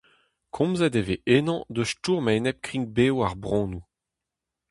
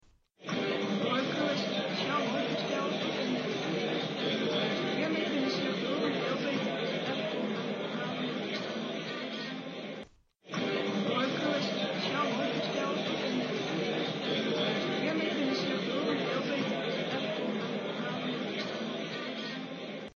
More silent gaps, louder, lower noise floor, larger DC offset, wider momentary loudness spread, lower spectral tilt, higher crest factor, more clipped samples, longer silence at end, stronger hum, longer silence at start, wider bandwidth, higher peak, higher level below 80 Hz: neither; first, -25 LUFS vs -32 LUFS; first, -86 dBFS vs -53 dBFS; neither; about the same, 7 LU vs 6 LU; first, -6 dB/octave vs -3 dB/octave; about the same, 20 dB vs 16 dB; neither; first, 0.9 s vs 0.05 s; neither; first, 0.55 s vs 0.4 s; first, 11.5 kHz vs 7.2 kHz; first, -6 dBFS vs -18 dBFS; first, -50 dBFS vs -74 dBFS